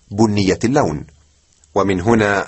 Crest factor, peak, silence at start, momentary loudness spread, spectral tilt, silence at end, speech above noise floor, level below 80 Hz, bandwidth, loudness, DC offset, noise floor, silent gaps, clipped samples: 16 dB; -2 dBFS; 0.1 s; 7 LU; -6 dB/octave; 0 s; 39 dB; -42 dBFS; 8.6 kHz; -17 LUFS; under 0.1%; -54 dBFS; none; under 0.1%